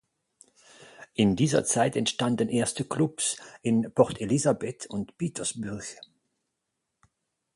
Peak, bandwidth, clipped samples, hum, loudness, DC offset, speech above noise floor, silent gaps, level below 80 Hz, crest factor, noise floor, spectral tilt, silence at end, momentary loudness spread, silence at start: -6 dBFS; 11.5 kHz; under 0.1%; none; -27 LUFS; under 0.1%; 55 dB; none; -60 dBFS; 22 dB; -82 dBFS; -4.5 dB/octave; 1.6 s; 12 LU; 1 s